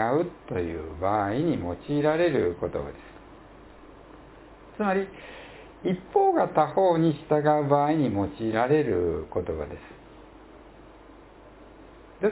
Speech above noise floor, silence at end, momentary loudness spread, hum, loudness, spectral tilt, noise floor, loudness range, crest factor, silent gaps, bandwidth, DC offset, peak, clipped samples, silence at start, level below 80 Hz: 24 dB; 0 s; 17 LU; none; -26 LUFS; -11 dB/octave; -49 dBFS; 10 LU; 20 dB; none; 4 kHz; under 0.1%; -6 dBFS; under 0.1%; 0 s; -50 dBFS